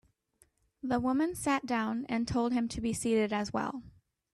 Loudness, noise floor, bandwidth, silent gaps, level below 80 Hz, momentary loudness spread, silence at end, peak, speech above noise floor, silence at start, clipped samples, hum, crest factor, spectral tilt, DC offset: -32 LUFS; -70 dBFS; 13 kHz; none; -58 dBFS; 6 LU; 0.45 s; -18 dBFS; 39 dB; 0.85 s; under 0.1%; none; 16 dB; -5 dB/octave; under 0.1%